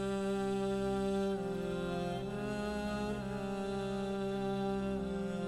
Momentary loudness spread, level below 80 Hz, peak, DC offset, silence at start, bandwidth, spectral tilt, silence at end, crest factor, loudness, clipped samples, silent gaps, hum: 4 LU; -54 dBFS; -26 dBFS; under 0.1%; 0 s; 13.5 kHz; -6.5 dB/octave; 0 s; 10 dB; -37 LUFS; under 0.1%; none; none